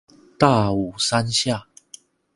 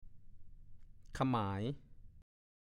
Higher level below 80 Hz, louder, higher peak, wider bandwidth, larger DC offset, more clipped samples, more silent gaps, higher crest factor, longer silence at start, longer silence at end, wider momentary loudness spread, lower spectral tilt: first, -50 dBFS vs -58 dBFS; first, -20 LUFS vs -39 LUFS; first, 0 dBFS vs -22 dBFS; about the same, 11.5 kHz vs 12 kHz; neither; neither; neither; about the same, 22 dB vs 20 dB; first, 0.4 s vs 0 s; first, 0.75 s vs 0.4 s; second, 7 LU vs 16 LU; second, -4.5 dB/octave vs -7.5 dB/octave